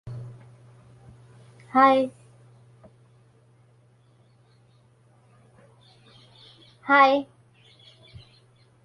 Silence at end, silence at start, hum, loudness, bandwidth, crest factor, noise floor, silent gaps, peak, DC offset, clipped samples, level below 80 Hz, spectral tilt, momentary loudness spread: 1.6 s; 0.05 s; none; -20 LUFS; 11.5 kHz; 24 dB; -59 dBFS; none; -6 dBFS; under 0.1%; under 0.1%; -68 dBFS; -6 dB/octave; 24 LU